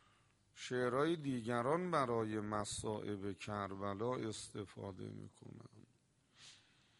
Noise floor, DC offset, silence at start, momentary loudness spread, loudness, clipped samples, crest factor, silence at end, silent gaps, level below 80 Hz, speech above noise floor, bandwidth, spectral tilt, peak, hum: -75 dBFS; under 0.1%; 0.55 s; 21 LU; -41 LUFS; under 0.1%; 20 dB; 0.45 s; none; -72 dBFS; 34 dB; 11.5 kHz; -5.5 dB/octave; -22 dBFS; none